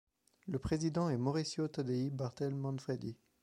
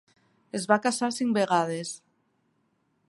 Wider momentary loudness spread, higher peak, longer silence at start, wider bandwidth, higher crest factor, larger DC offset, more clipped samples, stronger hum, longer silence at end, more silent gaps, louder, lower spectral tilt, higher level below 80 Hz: second, 8 LU vs 13 LU; second, -22 dBFS vs -6 dBFS; about the same, 0.45 s vs 0.55 s; about the same, 11.5 kHz vs 11.5 kHz; second, 16 dB vs 24 dB; neither; neither; neither; second, 0.3 s vs 1.1 s; neither; second, -38 LUFS vs -26 LUFS; first, -6.5 dB/octave vs -4 dB/octave; first, -60 dBFS vs -78 dBFS